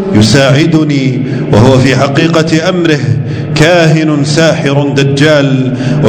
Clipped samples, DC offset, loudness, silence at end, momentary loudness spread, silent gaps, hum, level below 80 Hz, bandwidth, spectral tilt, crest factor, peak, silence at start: 4%; under 0.1%; -8 LUFS; 0 s; 6 LU; none; none; -36 dBFS; 11 kHz; -6 dB/octave; 8 dB; 0 dBFS; 0 s